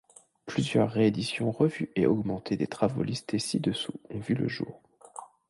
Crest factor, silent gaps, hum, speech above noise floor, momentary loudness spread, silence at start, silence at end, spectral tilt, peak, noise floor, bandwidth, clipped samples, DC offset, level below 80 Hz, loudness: 18 dB; none; none; 19 dB; 13 LU; 0.45 s; 0.25 s; -6 dB/octave; -10 dBFS; -48 dBFS; 11.5 kHz; under 0.1%; under 0.1%; -60 dBFS; -29 LUFS